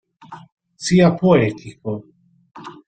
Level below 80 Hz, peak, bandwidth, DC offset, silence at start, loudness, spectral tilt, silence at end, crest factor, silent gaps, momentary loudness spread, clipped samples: -52 dBFS; -2 dBFS; 9 kHz; under 0.1%; 0.3 s; -17 LUFS; -6.5 dB/octave; 0.15 s; 18 dB; 0.52-0.57 s; 20 LU; under 0.1%